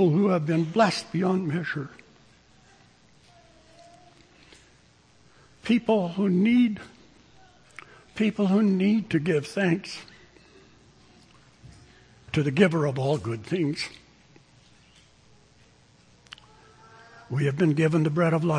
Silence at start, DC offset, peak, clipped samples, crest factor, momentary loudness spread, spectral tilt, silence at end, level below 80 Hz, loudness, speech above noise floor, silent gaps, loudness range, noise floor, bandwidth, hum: 0 s; under 0.1%; -4 dBFS; under 0.1%; 22 dB; 19 LU; -7 dB/octave; 0 s; -62 dBFS; -25 LUFS; 35 dB; none; 10 LU; -58 dBFS; 10.5 kHz; none